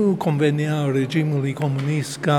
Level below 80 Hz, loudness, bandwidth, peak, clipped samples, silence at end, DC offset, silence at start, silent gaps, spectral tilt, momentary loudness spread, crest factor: -68 dBFS; -21 LUFS; 13.5 kHz; -4 dBFS; under 0.1%; 0 s; under 0.1%; 0 s; none; -7 dB/octave; 4 LU; 16 dB